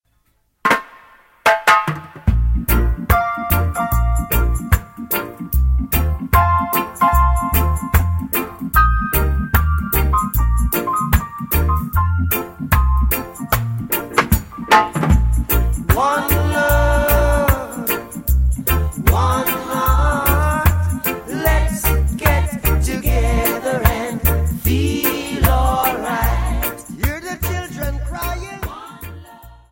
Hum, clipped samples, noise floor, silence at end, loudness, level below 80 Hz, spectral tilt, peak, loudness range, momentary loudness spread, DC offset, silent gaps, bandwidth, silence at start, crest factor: none; under 0.1%; -62 dBFS; 0.2 s; -17 LUFS; -20 dBFS; -5.5 dB/octave; 0 dBFS; 2 LU; 7 LU; under 0.1%; none; 17 kHz; 0.65 s; 16 dB